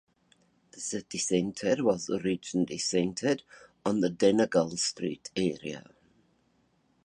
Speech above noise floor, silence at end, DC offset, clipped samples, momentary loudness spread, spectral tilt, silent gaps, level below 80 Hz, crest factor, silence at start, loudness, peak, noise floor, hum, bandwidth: 41 dB; 1.25 s; under 0.1%; under 0.1%; 10 LU; -4.5 dB/octave; none; -66 dBFS; 20 dB; 0.75 s; -29 LUFS; -10 dBFS; -70 dBFS; none; 11.5 kHz